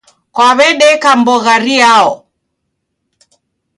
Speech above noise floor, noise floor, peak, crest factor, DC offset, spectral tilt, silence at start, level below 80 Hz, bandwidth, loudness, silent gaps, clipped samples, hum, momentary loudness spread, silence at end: 61 dB; -69 dBFS; 0 dBFS; 10 dB; under 0.1%; -2 dB/octave; 0.35 s; -58 dBFS; 11.5 kHz; -8 LUFS; none; under 0.1%; none; 7 LU; 1.6 s